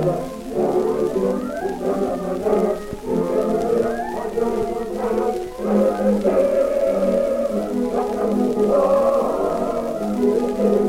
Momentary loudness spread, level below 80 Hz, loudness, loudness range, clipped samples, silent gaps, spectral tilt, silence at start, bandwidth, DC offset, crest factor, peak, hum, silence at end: 7 LU; -44 dBFS; -21 LUFS; 3 LU; under 0.1%; none; -7 dB/octave; 0 s; 16.5 kHz; under 0.1%; 14 dB; -6 dBFS; none; 0 s